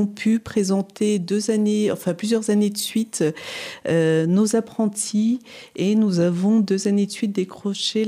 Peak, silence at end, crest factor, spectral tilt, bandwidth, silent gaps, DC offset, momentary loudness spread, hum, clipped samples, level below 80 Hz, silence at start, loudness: -8 dBFS; 0 s; 14 dB; -5.5 dB/octave; 15.5 kHz; none; under 0.1%; 6 LU; none; under 0.1%; -62 dBFS; 0 s; -21 LUFS